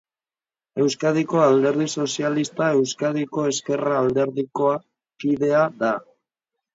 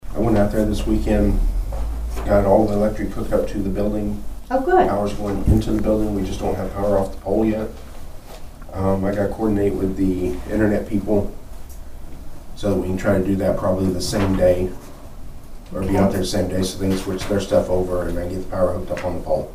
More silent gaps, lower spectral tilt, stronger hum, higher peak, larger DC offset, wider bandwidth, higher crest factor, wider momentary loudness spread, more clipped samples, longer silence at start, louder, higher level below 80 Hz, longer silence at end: neither; second, -5 dB/octave vs -7 dB/octave; neither; about the same, -4 dBFS vs -2 dBFS; neither; second, 7.8 kHz vs 15.5 kHz; about the same, 18 dB vs 18 dB; second, 6 LU vs 22 LU; neither; first, 0.75 s vs 0.05 s; about the same, -22 LUFS vs -21 LUFS; second, -64 dBFS vs -28 dBFS; first, 0.75 s vs 0 s